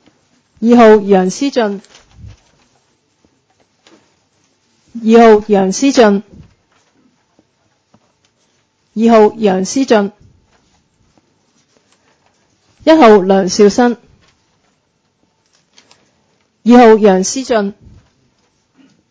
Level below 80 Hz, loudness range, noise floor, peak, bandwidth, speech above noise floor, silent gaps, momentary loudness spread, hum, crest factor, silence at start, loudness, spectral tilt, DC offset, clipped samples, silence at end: -50 dBFS; 7 LU; -61 dBFS; 0 dBFS; 8 kHz; 53 dB; none; 13 LU; none; 14 dB; 0.6 s; -10 LUFS; -5.5 dB/octave; under 0.1%; 0.5%; 1.4 s